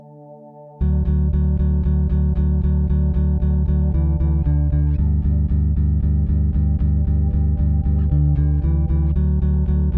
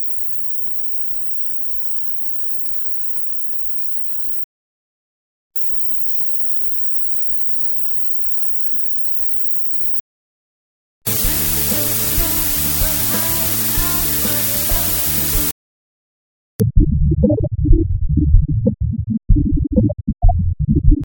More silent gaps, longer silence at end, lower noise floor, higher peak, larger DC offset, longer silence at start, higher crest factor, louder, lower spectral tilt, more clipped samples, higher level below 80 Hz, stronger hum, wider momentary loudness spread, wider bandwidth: second, none vs 4.44-5.50 s, 10.00-11.01 s, 15.52-16.59 s; about the same, 0 s vs 0 s; second, -41 dBFS vs under -90 dBFS; second, -8 dBFS vs 0 dBFS; neither; about the same, 0.1 s vs 0 s; second, 10 dB vs 16 dB; second, -19 LUFS vs -15 LUFS; first, -13.5 dB/octave vs -4.5 dB/octave; neither; about the same, -18 dBFS vs -22 dBFS; neither; second, 1 LU vs 5 LU; second, 1.8 kHz vs over 20 kHz